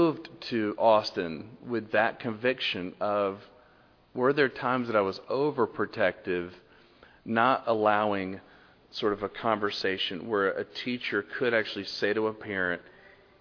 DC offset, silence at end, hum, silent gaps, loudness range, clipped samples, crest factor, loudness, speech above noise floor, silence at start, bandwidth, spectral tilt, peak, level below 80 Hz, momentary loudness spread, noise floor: under 0.1%; 0.35 s; none; none; 2 LU; under 0.1%; 20 dB; -29 LUFS; 32 dB; 0 s; 5.4 kHz; -6 dB/octave; -8 dBFS; -68 dBFS; 10 LU; -60 dBFS